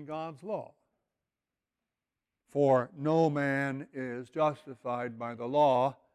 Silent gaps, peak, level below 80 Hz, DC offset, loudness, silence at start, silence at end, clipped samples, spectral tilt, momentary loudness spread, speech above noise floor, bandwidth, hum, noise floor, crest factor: none; -14 dBFS; -76 dBFS; under 0.1%; -31 LUFS; 0 s; 0.2 s; under 0.1%; -7.5 dB/octave; 13 LU; over 60 dB; 11.5 kHz; none; under -90 dBFS; 18 dB